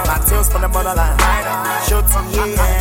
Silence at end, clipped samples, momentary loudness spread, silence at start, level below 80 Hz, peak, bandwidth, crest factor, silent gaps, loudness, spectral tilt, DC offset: 0 s; under 0.1%; 3 LU; 0 s; -16 dBFS; 0 dBFS; 17 kHz; 14 dB; none; -16 LUFS; -4 dB/octave; under 0.1%